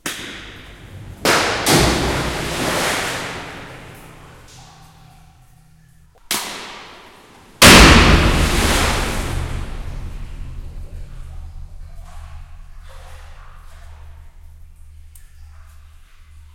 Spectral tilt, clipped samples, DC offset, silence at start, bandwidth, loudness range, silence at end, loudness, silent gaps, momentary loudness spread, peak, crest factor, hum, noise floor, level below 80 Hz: -3.5 dB/octave; 0.1%; under 0.1%; 0.05 s; 16.5 kHz; 23 LU; 0.15 s; -14 LUFS; none; 28 LU; 0 dBFS; 20 dB; none; -48 dBFS; -26 dBFS